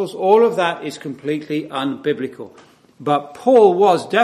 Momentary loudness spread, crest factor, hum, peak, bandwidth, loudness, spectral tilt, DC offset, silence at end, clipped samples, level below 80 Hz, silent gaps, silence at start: 16 LU; 18 dB; none; 0 dBFS; 13.5 kHz; -17 LUFS; -5.5 dB/octave; under 0.1%; 0 s; under 0.1%; -70 dBFS; none; 0 s